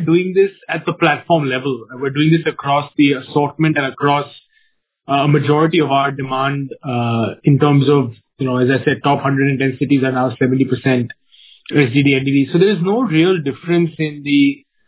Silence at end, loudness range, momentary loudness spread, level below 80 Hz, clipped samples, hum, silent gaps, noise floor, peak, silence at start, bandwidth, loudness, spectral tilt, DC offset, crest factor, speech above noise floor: 0.35 s; 2 LU; 7 LU; -56 dBFS; under 0.1%; none; none; -61 dBFS; 0 dBFS; 0 s; 4 kHz; -16 LUFS; -11 dB/octave; under 0.1%; 16 dB; 46 dB